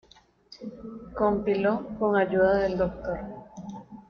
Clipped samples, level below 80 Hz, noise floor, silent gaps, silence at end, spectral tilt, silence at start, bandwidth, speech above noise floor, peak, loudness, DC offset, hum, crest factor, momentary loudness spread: under 0.1%; -50 dBFS; -55 dBFS; none; 0.1 s; -8 dB/octave; 0.5 s; 6.6 kHz; 29 dB; -12 dBFS; -26 LUFS; under 0.1%; none; 16 dB; 19 LU